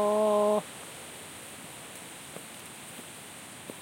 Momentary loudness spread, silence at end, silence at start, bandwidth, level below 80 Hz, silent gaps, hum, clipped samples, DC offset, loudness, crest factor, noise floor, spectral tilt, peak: 18 LU; 0 s; 0 s; 16.5 kHz; -74 dBFS; none; none; under 0.1%; under 0.1%; -34 LUFS; 18 dB; -46 dBFS; -4 dB/octave; -16 dBFS